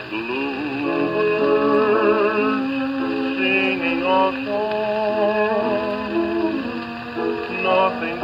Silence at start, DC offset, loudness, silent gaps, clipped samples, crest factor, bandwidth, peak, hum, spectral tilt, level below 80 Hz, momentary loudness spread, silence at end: 0 s; under 0.1%; -20 LUFS; none; under 0.1%; 16 dB; 7.4 kHz; -4 dBFS; none; -7 dB/octave; -54 dBFS; 7 LU; 0 s